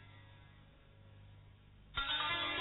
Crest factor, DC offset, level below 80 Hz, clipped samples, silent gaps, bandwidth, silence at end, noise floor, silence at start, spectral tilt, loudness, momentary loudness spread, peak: 18 dB; under 0.1%; -60 dBFS; under 0.1%; none; 4.3 kHz; 0 s; -61 dBFS; 0 s; 0.5 dB/octave; -37 LUFS; 26 LU; -26 dBFS